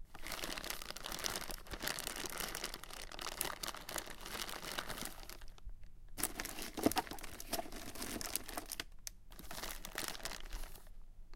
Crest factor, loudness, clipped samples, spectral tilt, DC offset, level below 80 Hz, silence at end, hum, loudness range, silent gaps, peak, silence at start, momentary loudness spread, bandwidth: 32 dB; -43 LUFS; under 0.1%; -2 dB/octave; under 0.1%; -52 dBFS; 0 s; none; 3 LU; none; -12 dBFS; 0 s; 14 LU; 17 kHz